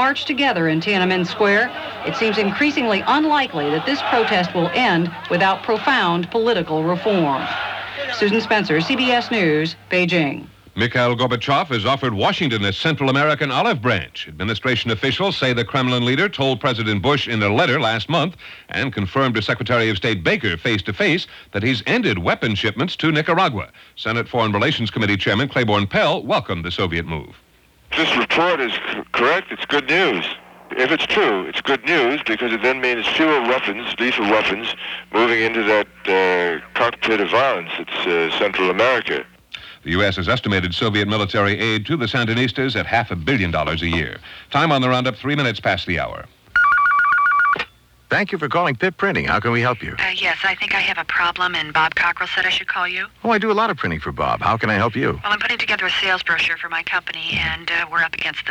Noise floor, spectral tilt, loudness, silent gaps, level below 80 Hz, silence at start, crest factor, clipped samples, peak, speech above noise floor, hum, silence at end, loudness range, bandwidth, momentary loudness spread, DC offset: -40 dBFS; -5.5 dB/octave; -18 LUFS; none; -48 dBFS; 0 s; 16 dB; under 0.1%; -4 dBFS; 21 dB; none; 0 s; 2 LU; 19.5 kHz; 7 LU; under 0.1%